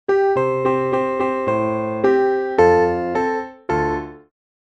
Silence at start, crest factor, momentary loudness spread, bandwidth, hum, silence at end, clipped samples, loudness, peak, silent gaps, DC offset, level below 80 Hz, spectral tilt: 0.1 s; 18 dB; 9 LU; 8.2 kHz; none; 0.6 s; under 0.1%; -19 LUFS; -2 dBFS; none; under 0.1%; -46 dBFS; -7.5 dB/octave